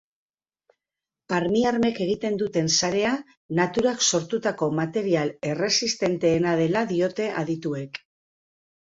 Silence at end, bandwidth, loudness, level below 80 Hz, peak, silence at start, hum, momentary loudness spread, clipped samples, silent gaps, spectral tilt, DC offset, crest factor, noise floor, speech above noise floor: 0.85 s; 8 kHz; -24 LUFS; -60 dBFS; -6 dBFS; 1.3 s; none; 7 LU; under 0.1%; 3.37-3.49 s; -4 dB/octave; under 0.1%; 18 dB; -89 dBFS; 65 dB